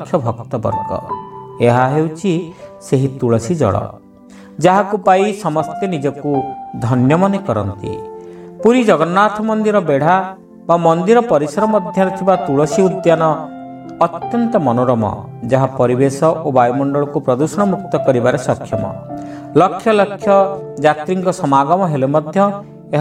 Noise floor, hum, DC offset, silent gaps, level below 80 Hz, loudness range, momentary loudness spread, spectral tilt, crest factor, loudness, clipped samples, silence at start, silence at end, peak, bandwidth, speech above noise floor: -39 dBFS; none; under 0.1%; none; -52 dBFS; 3 LU; 13 LU; -7 dB/octave; 14 dB; -15 LUFS; under 0.1%; 0 s; 0 s; 0 dBFS; 13.5 kHz; 25 dB